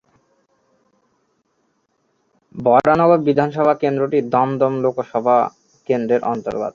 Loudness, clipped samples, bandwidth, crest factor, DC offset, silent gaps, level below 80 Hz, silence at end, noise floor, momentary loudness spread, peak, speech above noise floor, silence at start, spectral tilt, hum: -17 LUFS; under 0.1%; 7.2 kHz; 18 dB; under 0.1%; none; -58 dBFS; 0.05 s; -66 dBFS; 9 LU; -2 dBFS; 50 dB; 2.55 s; -8.5 dB/octave; none